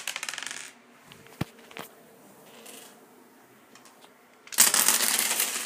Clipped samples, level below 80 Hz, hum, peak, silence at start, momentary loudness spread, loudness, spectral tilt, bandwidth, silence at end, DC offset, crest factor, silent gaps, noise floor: under 0.1%; -70 dBFS; none; 0 dBFS; 0 s; 27 LU; -23 LUFS; 0 dB/octave; 16 kHz; 0 s; under 0.1%; 30 dB; none; -56 dBFS